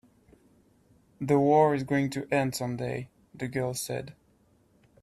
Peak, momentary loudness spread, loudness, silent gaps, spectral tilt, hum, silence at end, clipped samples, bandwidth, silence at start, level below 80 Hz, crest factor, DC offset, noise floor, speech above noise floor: -10 dBFS; 16 LU; -28 LUFS; none; -6 dB/octave; none; 0.9 s; under 0.1%; 15 kHz; 1.2 s; -64 dBFS; 18 dB; under 0.1%; -65 dBFS; 38 dB